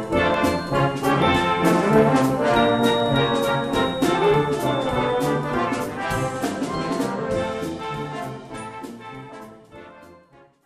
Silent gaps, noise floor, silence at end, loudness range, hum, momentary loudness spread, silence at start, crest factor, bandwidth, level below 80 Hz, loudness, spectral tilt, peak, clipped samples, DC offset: none; -52 dBFS; 0.5 s; 10 LU; none; 16 LU; 0 s; 16 dB; 14 kHz; -46 dBFS; -21 LUFS; -5.5 dB/octave; -6 dBFS; under 0.1%; under 0.1%